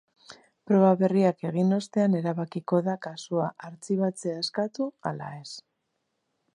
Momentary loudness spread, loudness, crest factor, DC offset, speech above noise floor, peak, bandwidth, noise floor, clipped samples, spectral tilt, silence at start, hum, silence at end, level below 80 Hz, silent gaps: 16 LU; -26 LUFS; 18 dB; under 0.1%; 52 dB; -10 dBFS; 10.5 kHz; -78 dBFS; under 0.1%; -7 dB/octave; 0.3 s; none; 0.95 s; -76 dBFS; none